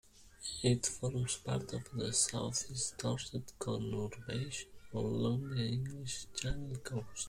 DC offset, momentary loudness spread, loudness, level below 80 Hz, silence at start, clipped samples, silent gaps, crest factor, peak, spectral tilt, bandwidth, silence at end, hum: under 0.1%; 10 LU; -38 LUFS; -56 dBFS; 0.15 s; under 0.1%; none; 20 dB; -18 dBFS; -4 dB/octave; 15.5 kHz; 0 s; none